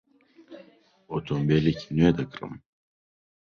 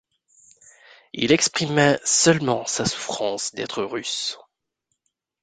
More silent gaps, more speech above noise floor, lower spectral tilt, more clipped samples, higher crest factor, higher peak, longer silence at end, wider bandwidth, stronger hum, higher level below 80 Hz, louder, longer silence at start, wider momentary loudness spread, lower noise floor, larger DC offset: neither; second, 31 dB vs 56 dB; first, -8 dB/octave vs -3 dB/octave; neither; about the same, 20 dB vs 22 dB; second, -8 dBFS vs -2 dBFS; second, 0.85 s vs 1.05 s; second, 6.8 kHz vs 10 kHz; neither; first, -50 dBFS vs -58 dBFS; second, -25 LUFS vs -21 LUFS; second, 0.5 s vs 1.15 s; first, 17 LU vs 11 LU; second, -56 dBFS vs -77 dBFS; neither